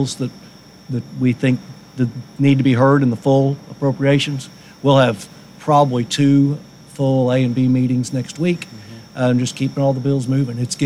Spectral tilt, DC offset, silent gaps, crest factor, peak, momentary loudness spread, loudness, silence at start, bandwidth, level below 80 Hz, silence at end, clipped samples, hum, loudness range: -6.5 dB/octave; under 0.1%; none; 16 dB; -2 dBFS; 14 LU; -17 LUFS; 0 s; 12 kHz; -58 dBFS; 0 s; under 0.1%; none; 3 LU